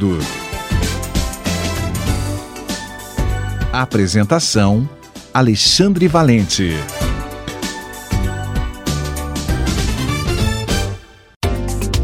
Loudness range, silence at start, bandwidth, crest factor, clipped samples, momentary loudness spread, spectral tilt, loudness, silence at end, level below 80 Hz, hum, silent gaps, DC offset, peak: 7 LU; 0 s; 16.5 kHz; 18 dB; under 0.1%; 13 LU; -4.5 dB/octave; -18 LUFS; 0 s; -26 dBFS; none; 11.36-11.40 s; under 0.1%; 0 dBFS